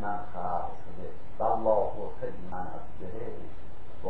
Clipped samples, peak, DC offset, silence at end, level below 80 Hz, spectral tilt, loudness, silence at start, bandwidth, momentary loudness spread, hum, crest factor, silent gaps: under 0.1%; -12 dBFS; 5%; 0 s; -52 dBFS; -9 dB/octave; -33 LUFS; 0 s; 8.2 kHz; 18 LU; none; 20 dB; none